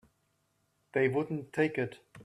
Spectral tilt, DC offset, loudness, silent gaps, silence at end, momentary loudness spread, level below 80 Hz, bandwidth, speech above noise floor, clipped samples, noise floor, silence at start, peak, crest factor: -7.5 dB/octave; under 0.1%; -32 LUFS; none; 0 s; 7 LU; -72 dBFS; 12 kHz; 44 dB; under 0.1%; -76 dBFS; 0.95 s; -14 dBFS; 20 dB